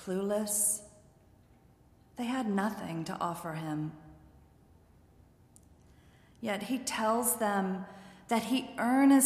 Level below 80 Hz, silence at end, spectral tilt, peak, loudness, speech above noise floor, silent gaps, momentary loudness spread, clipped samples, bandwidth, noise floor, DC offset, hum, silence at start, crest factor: -66 dBFS; 0 s; -4 dB/octave; -12 dBFS; -32 LUFS; 31 dB; none; 13 LU; under 0.1%; 15.5 kHz; -62 dBFS; under 0.1%; none; 0 s; 22 dB